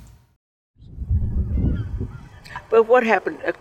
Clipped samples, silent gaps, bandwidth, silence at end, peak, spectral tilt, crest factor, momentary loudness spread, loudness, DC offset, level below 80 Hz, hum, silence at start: under 0.1%; 0.36-0.74 s; 8.8 kHz; 0.1 s; -4 dBFS; -8 dB/octave; 18 dB; 21 LU; -21 LUFS; under 0.1%; -30 dBFS; none; 0 s